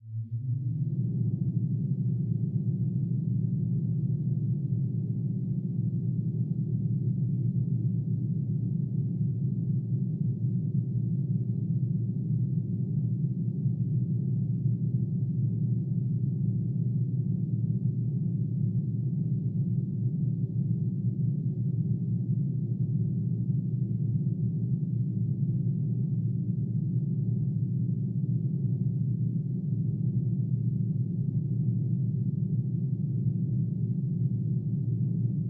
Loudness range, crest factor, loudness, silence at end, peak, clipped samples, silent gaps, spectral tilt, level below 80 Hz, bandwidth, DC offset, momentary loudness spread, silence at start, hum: 1 LU; 12 dB; -30 LUFS; 0 s; -16 dBFS; under 0.1%; none; -17.5 dB/octave; -58 dBFS; 0.8 kHz; under 0.1%; 1 LU; 0 s; none